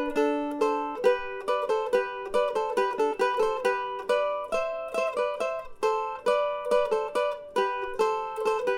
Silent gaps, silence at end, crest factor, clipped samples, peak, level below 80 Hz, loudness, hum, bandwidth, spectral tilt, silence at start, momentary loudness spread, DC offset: none; 0 s; 16 dB; under 0.1%; -10 dBFS; -58 dBFS; -28 LUFS; none; 16 kHz; -3.5 dB/octave; 0 s; 4 LU; under 0.1%